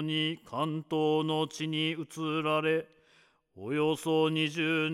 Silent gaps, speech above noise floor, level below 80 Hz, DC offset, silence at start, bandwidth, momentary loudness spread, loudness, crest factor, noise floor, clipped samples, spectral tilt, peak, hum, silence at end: none; 35 dB; -78 dBFS; under 0.1%; 0 s; 14 kHz; 6 LU; -30 LUFS; 14 dB; -65 dBFS; under 0.1%; -5.5 dB/octave; -18 dBFS; none; 0 s